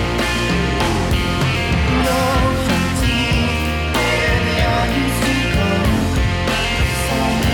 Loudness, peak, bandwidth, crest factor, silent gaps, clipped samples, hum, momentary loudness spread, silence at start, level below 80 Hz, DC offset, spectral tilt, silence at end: -17 LUFS; -6 dBFS; 18 kHz; 10 dB; none; under 0.1%; none; 2 LU; 0 s; -24 dBFS; under 0.1%; -5 dB/octave; 0 s